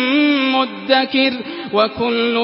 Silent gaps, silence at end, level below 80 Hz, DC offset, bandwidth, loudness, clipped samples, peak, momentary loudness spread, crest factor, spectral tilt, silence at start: none; 0 s; -56 dBFS; under 0.1%; 5.8 kHz; -16 LUFS; under 0.1%; -2 dBFS; 5 LU; 16 dB; -8.5 dB/octave; 0 s